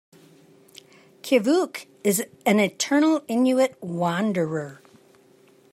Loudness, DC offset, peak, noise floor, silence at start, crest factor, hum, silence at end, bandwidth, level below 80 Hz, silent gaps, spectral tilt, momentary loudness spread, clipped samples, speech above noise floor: -23 LUFS; under 0.1%; -6 dBFS; -56 dBFS; 1.25 s; 18 dB; none; 1 s; 16 kHz; -76 dBFS; none; -4.5 dB/octave; 9 LU; under 0.1%; 34 dB